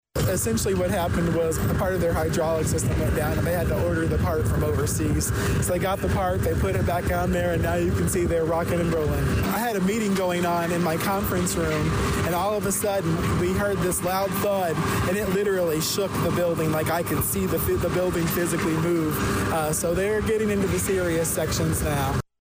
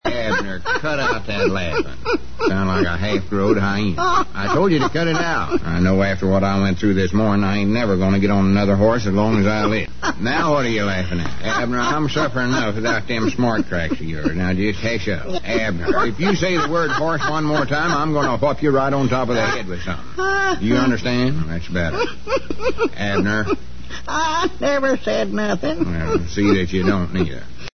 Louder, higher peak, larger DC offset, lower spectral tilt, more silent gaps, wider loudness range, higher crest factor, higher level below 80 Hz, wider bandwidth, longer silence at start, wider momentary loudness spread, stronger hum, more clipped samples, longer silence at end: second, -24 LUFS vs -19 LUFS; second, -14 dBFS vs -4 dBFS; second, under 0.1% vs 5%; about the same, -5.5 dB/octave vs -6 dB/octave; neither; second, 0 LU vs 3 LU; second, 10 dB vs 16 dB; about the same, -36 dBFS vs -38 dBFS; first, 16 kHz vs 6.6 kHz; first, 0.15 s vs 0 s; second, 1 LU vs 6 LU; neither; neither; first, 0.2 s vs 0 s